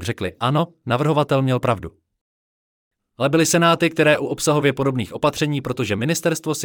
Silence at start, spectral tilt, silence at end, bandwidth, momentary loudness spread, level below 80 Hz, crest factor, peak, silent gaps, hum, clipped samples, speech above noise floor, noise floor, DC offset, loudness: 0 s; -5 dB/octave; 0 s; 18.5 kHz; 7 LU; -54 dBFS; 16 dB; -4 dBFS; 2.21-2.91 s; none; under 0.1%; over 71 dB; under -90 dBFS; under 0.1%; -19 LUFS